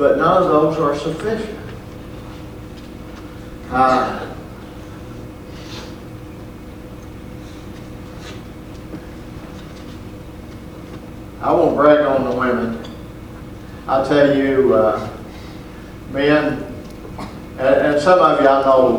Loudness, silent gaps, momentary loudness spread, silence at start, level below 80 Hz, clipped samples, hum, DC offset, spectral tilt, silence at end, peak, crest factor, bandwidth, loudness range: -16 LUFS; none; 22 LU; 0 s; -40 dBFS; under 0.1%; none; under 0.1%; -6.5 dB/octave; 0 s; 0 dBFS; 18 dB; 20 kHz; 17 LU